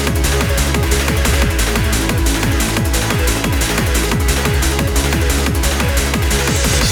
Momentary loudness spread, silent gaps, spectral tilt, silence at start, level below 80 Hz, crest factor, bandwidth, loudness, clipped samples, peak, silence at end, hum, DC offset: 1 LU; none; -4 dB/octave; 0 s; -18 dBFS; 14 dB; over 20 kHz; -15 LUFS; under 0.1%; -2 dBFS; 0 s; none; under 0.1%